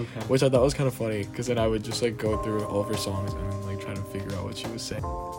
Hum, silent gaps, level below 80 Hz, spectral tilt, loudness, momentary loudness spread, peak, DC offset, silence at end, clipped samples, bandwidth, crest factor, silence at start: none; none; -44 dBFS; -5.5 dB/octave; -28 LUFS; 11 LU; -10 dBFS; under 0.1%; 0 s; under 0.1%; 18 kHz; 18 dB; 0 s